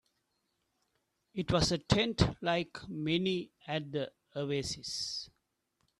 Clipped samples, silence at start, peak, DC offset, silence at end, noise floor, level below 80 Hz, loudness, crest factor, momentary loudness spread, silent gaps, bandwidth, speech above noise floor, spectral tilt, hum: under 0.1%; 1.35 s; -12 dBFS; under 0.1%; 0.75 s; -81 dBFS; -52 dBFS; -34 LUFS; 24 dB; 11 LU; none; 12.5 kHz; 47 dB; -5 dB/octave; none